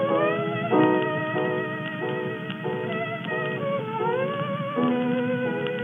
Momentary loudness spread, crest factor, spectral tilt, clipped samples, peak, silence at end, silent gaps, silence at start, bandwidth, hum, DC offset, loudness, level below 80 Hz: 8 LU; 18 dB; -8.5 dB/octave; under 0.1%; -8 dBFS; 0 s; none; 0 s; 3.9 kHz; none; under 0.1%; -26 LUFS; -86 dBFS